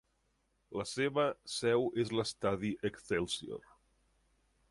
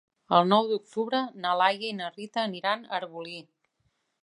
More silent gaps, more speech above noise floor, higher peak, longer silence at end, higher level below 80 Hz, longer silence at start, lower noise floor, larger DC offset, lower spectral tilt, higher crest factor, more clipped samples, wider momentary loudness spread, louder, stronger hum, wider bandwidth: neither; second, 42 dB vs 47 dB; second, -18 dBFS vs -6 dBFS; first, 1.1 s vs 0.8 s; first, -66 dBFS vs -82 dBFS; first, 0.7 s vs 0.3 s; about the same, -77 dBFS vs -75 dBFS; neither; about the same, -4.5 dB/octave vs -5.5 dB/octave; about the same, 18 dB vs 22 dB; neither; second, 10 LU vs 14 LU; second, -35 LUFS vs -27 LUFS; neither; about the same, 11.5 kHz vs 11 kHz